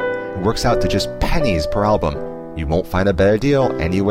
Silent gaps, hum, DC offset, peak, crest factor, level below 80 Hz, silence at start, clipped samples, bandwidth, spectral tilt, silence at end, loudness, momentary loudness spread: none; none; 0.5%; -4 dBFS; 12 dB; -28 dBFS; 0 s; under 0.1%; 16.5 kHz; -6 dB/octave; 0 s; -18 LUFS; 8 LU